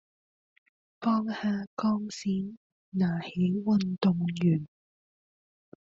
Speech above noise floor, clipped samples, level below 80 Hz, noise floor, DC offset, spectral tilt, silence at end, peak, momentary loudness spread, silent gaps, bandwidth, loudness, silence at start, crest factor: over 62 dB; under 0.1%; -66 dBFS; under -90 dBFS; under 0.1%; -7 dB/octave; 1.2 s; -14 dBFS; 7 LU; 1.67-1.77 s, 2.57-2.92 s; 7.6 kHz; -29 LUFS; 1 s; 16 dB